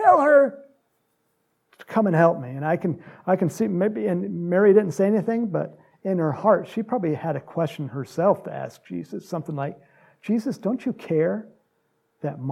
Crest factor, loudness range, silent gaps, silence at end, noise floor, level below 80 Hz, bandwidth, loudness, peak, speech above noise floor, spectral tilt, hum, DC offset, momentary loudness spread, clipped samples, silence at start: 18 dB; 6 LU; none; 0 s; -71 dBFS; -74 dBFS; 14 kHz; -23 LUFS; -4 dBFS; 48 dB; -8 dB/octave; none; under 0.1%; 16 LU; under 0.1%; 0 s